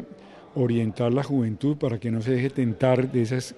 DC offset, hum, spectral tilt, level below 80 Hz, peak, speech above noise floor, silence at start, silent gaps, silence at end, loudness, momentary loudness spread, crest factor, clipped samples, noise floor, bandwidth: under 0.1%; none; -7.5 dB/octave; -60 dBFS; -6 dBFS; 22 dB; 0 s; none; 0 s; -25 LUFS; 5 LU; 18 dB; under 0.1%; -46 dBFS; 12 kHz